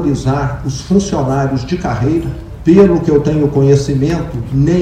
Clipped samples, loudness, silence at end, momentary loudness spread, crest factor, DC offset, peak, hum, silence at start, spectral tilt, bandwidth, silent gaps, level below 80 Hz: 0.4%; -13 LUFS; 0 s; 9 LU; 12 dB; under 0.1%; 0 dBFS; none; 0 s; -7.5 dB/octave; 9.6 kHz; none; -30 dBFS